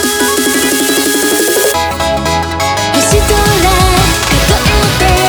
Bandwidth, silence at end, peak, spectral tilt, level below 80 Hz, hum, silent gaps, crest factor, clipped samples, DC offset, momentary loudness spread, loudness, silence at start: over 20 kHz; 0 s; 0 dBFS; -3.5 dB/octave; -20 dBFS; none; none; 10 dB; under 0.1%; under 0.1%; 4 LU; -10 LUFS; 0 s